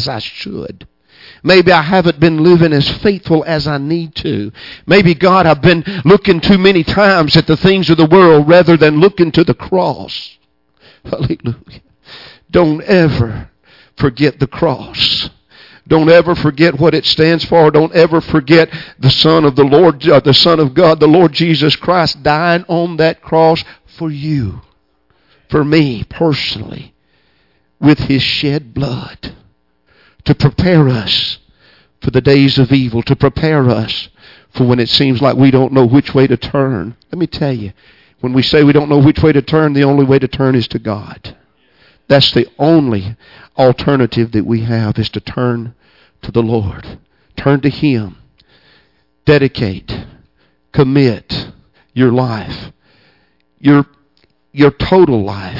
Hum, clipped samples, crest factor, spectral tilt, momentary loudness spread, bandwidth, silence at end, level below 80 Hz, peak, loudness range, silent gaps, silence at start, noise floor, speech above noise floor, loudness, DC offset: none; under 0.1%; 12 dB; -7.5 dB/octave; 15 LU; 5.8 kHz; 0 s; -38 dBFS; 0 dBFS; 8 LU; none; 0 s; -57 dBFS; 47 dB; -11 LUFS; under 0.1%